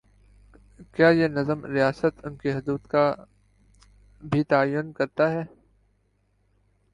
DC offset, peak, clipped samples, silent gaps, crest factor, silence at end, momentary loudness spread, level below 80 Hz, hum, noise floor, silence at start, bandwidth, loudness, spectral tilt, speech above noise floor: under 0.1%; -6 dBFS; under 0.1%; none; 20 dB; 1.45 s; 12 LU; -56 dBFS; none; -68 dBFS; 0.8 s; 10.5 kHz; -24 LUFS; -8 dB/octave; 44 dB